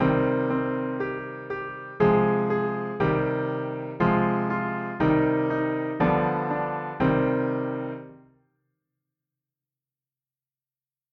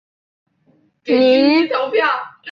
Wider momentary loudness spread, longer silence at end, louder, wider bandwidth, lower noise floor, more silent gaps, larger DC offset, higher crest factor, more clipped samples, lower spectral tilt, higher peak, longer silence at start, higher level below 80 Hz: about the same, 11 LU vs 10 LU; first, 2.95 s vs 0 s; second, -25 LUFS vs -15 LUFS; about the same, 5.8 kHz vs 6.2 kHz; first, under -90 dBFS vs -58 dBFS; neither; neither; about the same, 18 dB vs 14 dB; neither; first, -10 dB/octave vs -5.5 dB/octave; second, -8 dBFS vs -2 dBFS; second, 0 s vs 1.05 s; first, -52 dBFS vs -64 dBFS